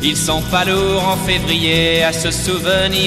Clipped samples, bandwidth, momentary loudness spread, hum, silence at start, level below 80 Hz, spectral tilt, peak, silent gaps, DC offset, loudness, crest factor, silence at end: under 0.1%; 16 kHz; 4 LU; none; 0 s; -32 dBFS; -3.5 dB/octave; -2 dBFS; none; under 0.1%; -15 LUFS; 14 dB; 0 s